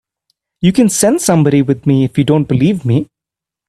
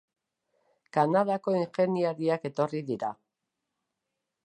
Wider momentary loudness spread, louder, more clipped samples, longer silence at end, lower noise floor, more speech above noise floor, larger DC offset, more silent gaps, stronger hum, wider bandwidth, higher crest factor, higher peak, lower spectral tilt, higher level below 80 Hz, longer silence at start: second, 5 LU vs 8 LU; first, -12 LUFS vs -29 LUFS; neither; second, 0.65 s vs 1.3 s; about the same, -85 dBFS vs -85 dBFS; first, 74 dB vs 57 dB; neither; neither; neither; first, 14.5 kHz vs 9.4 kHz; second, 12 dB vs 20 dB; first, 0 dBFS vs -10 dBFS; second, -6 dB/octave vs -7.5 dB/octave; first, -46 dBFS vs -80 dBFS; second, 0.6 s vs 0.95 s